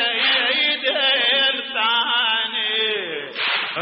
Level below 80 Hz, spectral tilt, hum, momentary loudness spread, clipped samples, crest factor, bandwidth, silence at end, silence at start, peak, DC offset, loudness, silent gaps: -76 dBFS; 3.5 dB/octave; none; 6 LU; under 0.1%; 14 dB; 5.8 kHz; 0 s; 0 s; -6 dBFS; under 0.1%; -18 LUFS; none